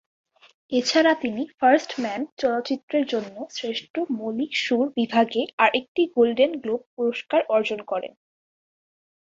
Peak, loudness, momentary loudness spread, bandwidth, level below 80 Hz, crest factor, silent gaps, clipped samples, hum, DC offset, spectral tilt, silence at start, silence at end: -4 dBFS; -23 LUFS; 10 LU; 7.8 kHz; -70 dBFS; 20 dB; 2.32-2.37 s, 2.83-2.88 s, 3.90-3.94 s, 5.53-5.58 s, 5.88-5.95 s, 6.86-6.97 s; under 0.1%; none; under 0.1%; -3.5 dB/octave; 0.7 s; 1.15 s